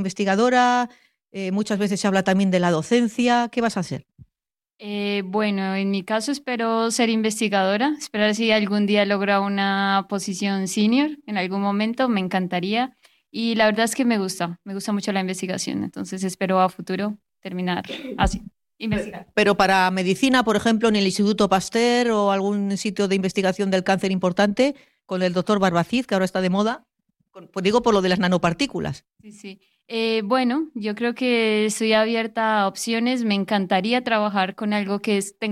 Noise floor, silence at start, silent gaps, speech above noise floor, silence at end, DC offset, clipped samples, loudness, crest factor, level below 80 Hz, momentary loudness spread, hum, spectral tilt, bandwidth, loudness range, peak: -88 dBFS; 0 s; none; 66 dB; 0 s; under 0.1%; under 0.1%; -21 LUFS; 16 dB; -48 dBFS; 10 LU; none; -5 dB/octave; 13.5 kHz; 4 LU; -4 dBFS